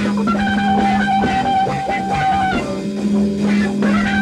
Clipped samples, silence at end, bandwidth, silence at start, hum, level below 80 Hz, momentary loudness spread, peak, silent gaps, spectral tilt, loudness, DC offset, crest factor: under 0.1%; 0 s; 10.5 kHz; 0 s; none; -38 dBFS; 4 LU; -4 dBFS; none; -6 dB/octave; -17 LUFS; under 0.1%; 12 dB